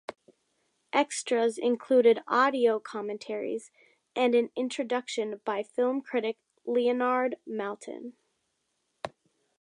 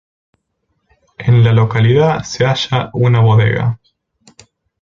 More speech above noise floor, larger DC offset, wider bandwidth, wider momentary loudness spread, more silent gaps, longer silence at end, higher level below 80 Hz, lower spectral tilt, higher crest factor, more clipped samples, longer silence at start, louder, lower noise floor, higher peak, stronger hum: second, 50 dB vs 56 dB; neither; first, 11 kHz vs 7.4 kHz; first, 17 LU vs 8 LU; neither; second, 0.55 s vs 1.05 s; second, -80 dBFS vs -44 dBFS; second, -3.5 dB/octave vs -6.5 dB/octave; first, 18 dB vs 12 dB; neither; second, 0.1 s vs 1.2 s; second, -28 LUFS vs -13 LUFS; first, -78 dBFS vs -67 dBFS; second, -10 dBFS vs -2 dBFS; neither